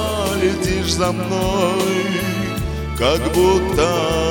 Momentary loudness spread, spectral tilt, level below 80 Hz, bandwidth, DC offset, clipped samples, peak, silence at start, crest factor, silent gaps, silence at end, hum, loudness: 6 LU; -5 dB/octave; -30 dBFS; 19 kHz; under 0.1%; under 0.1%; -2 dBFS; 0 s; 16 dB; none; 0 s; none; -18 LUFS